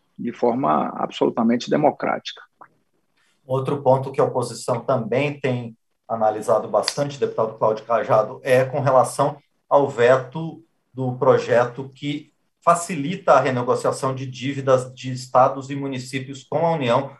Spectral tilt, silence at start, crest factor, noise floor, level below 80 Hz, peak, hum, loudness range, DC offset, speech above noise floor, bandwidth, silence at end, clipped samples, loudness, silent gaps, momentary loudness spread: -6 dB/octave; 0.2 s; 20 dB; -68 dBFS; -68 dBFS; -2 dBFS; none; 3 LU; under 0.1%; 47 dB; 12.5 kHz; 0.05 s; under 0.1%; -21 LUFS; none; 12 LU